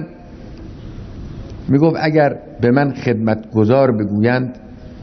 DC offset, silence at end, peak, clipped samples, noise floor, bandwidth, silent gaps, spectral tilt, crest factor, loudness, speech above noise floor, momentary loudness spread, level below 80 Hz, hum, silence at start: under 0.1%; 0 s; -2 dBFS; under 0.1%; -35 dBFS; 6.4 kHz; none; -9 dB/octave; 16 dB; -16 LUFS; 21 dB; 21 LU; -40 dBFS; none; 0 s